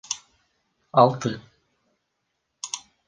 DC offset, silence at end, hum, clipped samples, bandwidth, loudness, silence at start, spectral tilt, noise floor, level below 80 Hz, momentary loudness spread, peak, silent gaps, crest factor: under 0.1%; 0.3 s; none; under 0.1%; 10 kHz; -23 LUFS; 0.1 s; -5 dB/octave; -77 dBFS; -68 dBFS; 18 LU; -4 dBFS; none; 24 dB